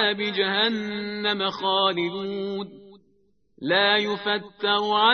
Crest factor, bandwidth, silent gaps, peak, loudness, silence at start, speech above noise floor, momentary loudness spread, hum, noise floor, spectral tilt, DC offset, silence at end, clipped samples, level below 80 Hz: 18 dB; 6.6 kHz; none; -6 dBFS; -23 LUFS; 0 s; 42 dB; 11 LU; none; -66 dBFS; -5 dB/octave; under 0.1%; 0 s; under 0.1%; -70 dBFS